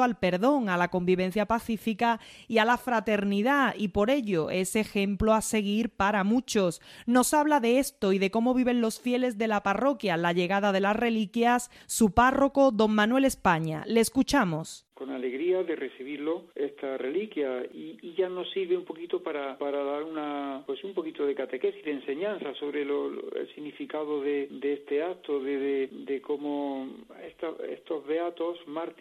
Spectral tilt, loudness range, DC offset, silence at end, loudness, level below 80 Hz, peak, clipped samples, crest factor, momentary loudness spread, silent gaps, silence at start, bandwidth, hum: -5 dB/octave; 8 LU; under 0.1%; 0.1 s; -28 LUFS; -54 dBFS; -8 dBFS; under 0.1%; 18 dB; 12 LU; none; 0 s; 15.5 kHz; none